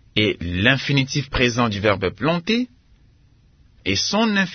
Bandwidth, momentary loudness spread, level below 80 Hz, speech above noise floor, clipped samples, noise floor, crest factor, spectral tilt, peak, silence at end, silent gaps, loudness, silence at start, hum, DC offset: 6.6 kHz; 5 LU; -42 dBFS; 34 dB; under 0.1%; -54 dBFS; 20 dB; -4.5 dB/octave; -2 dBFS; 0 s; none; -20 LUFS; 0.15 s; none; under 0.1%